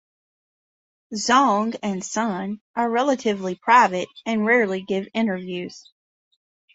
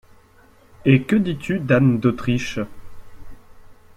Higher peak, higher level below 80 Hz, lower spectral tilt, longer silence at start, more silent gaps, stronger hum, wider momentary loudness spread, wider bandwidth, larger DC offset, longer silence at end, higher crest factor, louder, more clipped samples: about the same, -2 dBFS vs -2 dBFS; second, -68 dBFS vs -46 dBFS; second, -4 dB/octave vs -7.5 dB/octave; first, 1.1 s vs 0.8 s; first, 2.61-2.74 s vs none; neither; about the same, 13 LU vs 11 LU; second, 8 kHz vs 13 kHz; neither; first, 0.95 s vs 0.25 s; about the same, 20 dB vs 18 dB; about the same, -21 LUFS vs -20 LUFS; neither